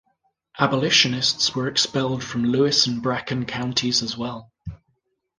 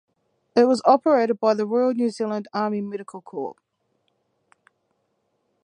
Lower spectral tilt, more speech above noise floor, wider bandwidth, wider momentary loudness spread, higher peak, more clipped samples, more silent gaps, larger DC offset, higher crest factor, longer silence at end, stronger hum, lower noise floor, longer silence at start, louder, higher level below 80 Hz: second, -3.5 dB/octave vs -6 dB/octave; about the same, 49 dB vs 51 dB; about the same, 10.5 kHz vs 10 kHz; about the same, 14 LU vs 15 LU; about the same, -2 dBFS vs -4 dBFS; neither; neither; neither; about the same, 22 dB vs 20 dB; second, 0.65 s vs 2.1 s; neither; about the same, -71 dBFS vs -72 dBFS; about the same, 0.55 s vs 0.55 s; about the same, -21 LUFS vs -21 LUFS; first, -54 dBFS vs -76 dBFS